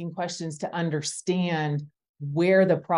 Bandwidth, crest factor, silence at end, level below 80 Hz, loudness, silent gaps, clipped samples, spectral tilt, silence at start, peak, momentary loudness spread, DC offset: 11.5 kHz; 16 dB; 0 s; -72 dBFS; -26 LUFS; 2.09-2.14 s; under 0.1%; -5.5 dB/octave; 0 s; -10 dBFS; 12 LU; under 0.1%